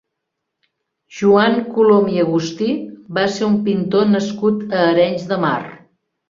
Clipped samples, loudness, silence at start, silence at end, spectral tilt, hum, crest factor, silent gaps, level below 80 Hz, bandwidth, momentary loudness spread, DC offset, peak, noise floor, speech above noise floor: under 0.1%; -16 LUFS; 1.1 s; 0.55 s; -6.5 dB/octave; none; 16 dB; none; -58 dBFS; 7.6 kHz; 9 LU; under 0.1%; -2 dBFS; -77 dBFS; 62 dB